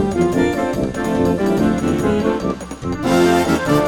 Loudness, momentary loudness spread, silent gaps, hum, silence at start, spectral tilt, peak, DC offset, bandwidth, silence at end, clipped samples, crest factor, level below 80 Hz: -18 LUFS; 8 LU; none; none; 0 s; -6 dB/octave; -2 dBFS; under 0.1%; 18.5 kHz; 0 s; under 0.1%; 14 dB; -38 dBFS